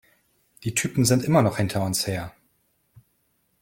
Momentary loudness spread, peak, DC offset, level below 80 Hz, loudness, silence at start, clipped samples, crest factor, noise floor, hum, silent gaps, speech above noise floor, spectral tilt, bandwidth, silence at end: 13 LU; -6 dBFS; under 0.1%; -56 dBFS; -23 LUFS; 0.6 s; under 0.1%; 20 dB; -69 dBFS; none; none; 47 dB; -5 dB/octave; 17 kHz; 1.3 s